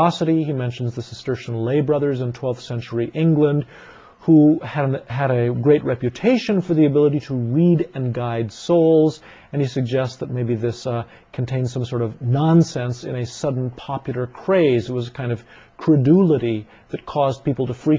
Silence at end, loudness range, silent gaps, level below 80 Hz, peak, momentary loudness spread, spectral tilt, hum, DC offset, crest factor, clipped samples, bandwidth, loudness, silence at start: 0 s; 4 LU; none; -52 dBFS; -4 dBFS; 12 LU; -8 dB/octave; none; under 0.1%; 16 dB; under 0.1%; 7.8 kHz; -20 LUFS; 0 s